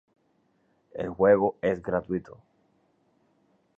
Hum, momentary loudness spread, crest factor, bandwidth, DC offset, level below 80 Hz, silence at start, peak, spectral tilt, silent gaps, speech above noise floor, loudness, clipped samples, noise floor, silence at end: none; 15 LU; 22 dB; 3.9 kHz; under 0.1%; -58 dBFS; 0.95 s; -8 dBFS; -9 dB/octave; none; 44 dB; -26 LUFS; under 0.1%; -69 dBFS; 1.45 s